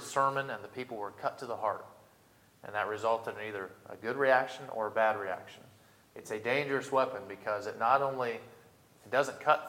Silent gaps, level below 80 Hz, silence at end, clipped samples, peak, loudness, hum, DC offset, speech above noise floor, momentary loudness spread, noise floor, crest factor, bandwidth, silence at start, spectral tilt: none; -80 dBFS; 0 s; under 0.1%; -10 dBFS; -33 LUFS; none; under 0.1%; 31 dB; 14 LU; -63 dBFS; 24 dB; 17 kHz; 0 s; -4.5 dB/octave